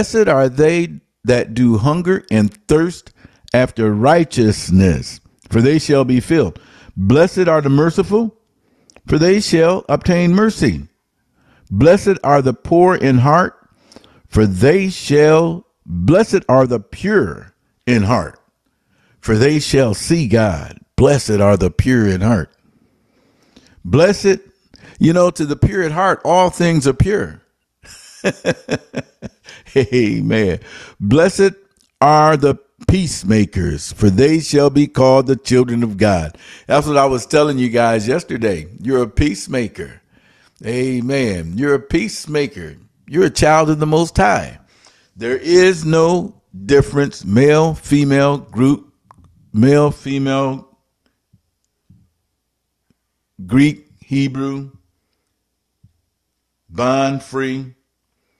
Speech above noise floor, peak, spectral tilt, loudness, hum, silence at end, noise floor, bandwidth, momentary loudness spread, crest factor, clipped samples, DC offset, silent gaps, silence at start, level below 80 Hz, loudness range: 58 dB; 0 dBFS; -6.5 dB/octave; -15 LUFS; none; 0.7 s; -72 dBFS; 13 kHz; 12 LU; 16 dB; under 0.1%; under 0.1%; none; 0 s; -38 dBFS; 7 LU